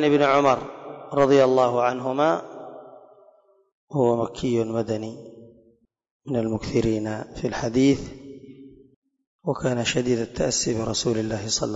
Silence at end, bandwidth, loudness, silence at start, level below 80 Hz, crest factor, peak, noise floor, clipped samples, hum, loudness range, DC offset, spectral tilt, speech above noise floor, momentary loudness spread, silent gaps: 0 s; 8 kHz; -23 LUFS; 0 s; -50 dBFS; 16 dB; -8 dBFS; -61 dBFS; under 0.1%; none; 5 LU; under 0.1%; -5 dB/octave; 39 dB; 21 LU; 3.72-3.88 s, 6.11-6.20 s, 8.96-9.02 s, 9.27-9.39 s